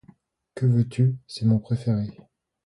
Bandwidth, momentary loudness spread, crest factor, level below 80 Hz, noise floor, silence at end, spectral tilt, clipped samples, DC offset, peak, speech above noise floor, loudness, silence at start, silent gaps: 11 kHz; 8 LU; 14 dB; -56 dBFS; -56 dBFS; 0.55 s; -8.5 dB/octave; under 0.1%; under 0.1%; -10 dBFS; 34 dB; -24 LUFS; 0.55 s; none